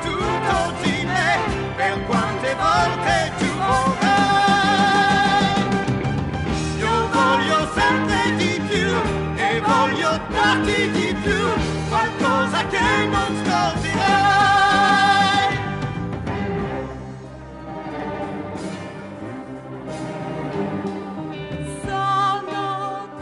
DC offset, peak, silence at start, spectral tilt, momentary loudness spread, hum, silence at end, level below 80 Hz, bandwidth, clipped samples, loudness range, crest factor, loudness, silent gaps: under 0.1%; -4 dBFS; 0 s; -4.5 dB/octave; 14 LU; none; 0 s; -40 dBFS; 11.5 kHz; under 0.1%; 12 LU; 16 dB; -19 LUFS; none